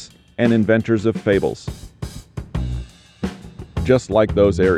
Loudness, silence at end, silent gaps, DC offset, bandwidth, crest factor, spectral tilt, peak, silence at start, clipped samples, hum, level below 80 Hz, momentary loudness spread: -19 LUFS; 0 s; none; under 0.1%; 13 kHz; 16 dB; -7 dB/octave; -4 dBFS; 0 s; under 0.1%; none; -34 dBFS; 18 LU